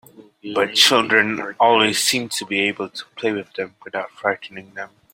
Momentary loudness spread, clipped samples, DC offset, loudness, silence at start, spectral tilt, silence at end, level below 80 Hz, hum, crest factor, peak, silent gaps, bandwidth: 18 LU; under 0.1%; under 0.1%; -18 LUFS; 0.2 s; -2 dB/octave; 0.25 s; -66 dBFS; none; 20 dB; 0 dBFS; none; 16.5 kHz